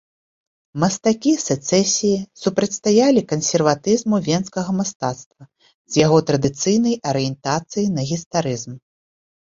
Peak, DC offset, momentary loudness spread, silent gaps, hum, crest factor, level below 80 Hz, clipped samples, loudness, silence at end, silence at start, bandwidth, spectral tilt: 0 dBFS; under 0.1%; 8 LU; 4.95-5.00 s, 5.26-5.31 s, 5.74-5.85 s, 8.26-8.31 s; none; 18 dB; -56 dBFS; under 0.1%; -19 LUFS; 0.8 s; 0.75 s; 7.8 kHz; -5 dB/octave